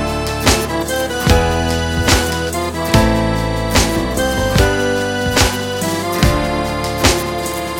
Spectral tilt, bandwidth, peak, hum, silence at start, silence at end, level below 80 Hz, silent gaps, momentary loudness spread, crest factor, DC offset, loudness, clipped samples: -4 dB/octave; 17 kHz; 0 dBFS; none; 0 s; 0 s; -24 dBFS; none; 5 LU; 16 dB; 0.1%; -16 LUFS; under 0.1%